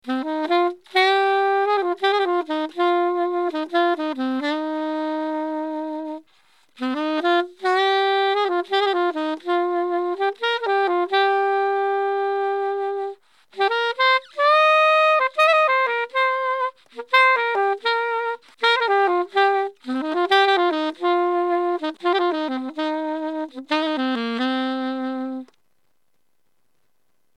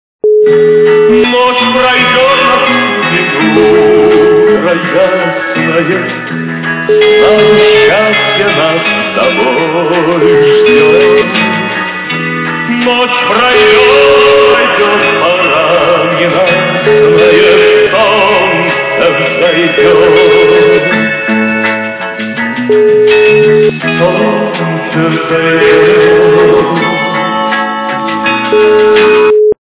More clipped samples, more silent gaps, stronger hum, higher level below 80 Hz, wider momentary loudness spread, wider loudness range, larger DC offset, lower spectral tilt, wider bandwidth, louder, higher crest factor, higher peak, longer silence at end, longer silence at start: second, under 0.1% vs 0.7%; neither; neither; second, -86 dBFS vs -42 dBFS; first, 10 LU vs 7 LU; first, 7 LU vs 2 LU; neither; second, -3 dB/octave vs -9 dB/octave; first, 11 kHz vs 4 kHz; second, -21 LUFS vs -7 LUFS; first, 16 dB vs 6 dB; second, -6 dBFS vs 0 dBFS; first, 1.95 s vs 0.15 s; second, 0.05 s vs 0.25 s